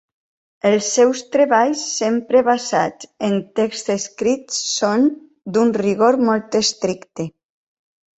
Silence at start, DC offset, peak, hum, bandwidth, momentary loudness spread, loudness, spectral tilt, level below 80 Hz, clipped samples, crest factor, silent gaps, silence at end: 0.65 s; under 0.1%; -2 dBFS; none; 8.2 kHz; 9 LU; -18 LUFS; -3.5 dB/octave; -62 dBFS; under 0.1%; 16 dB; none; 0.9 s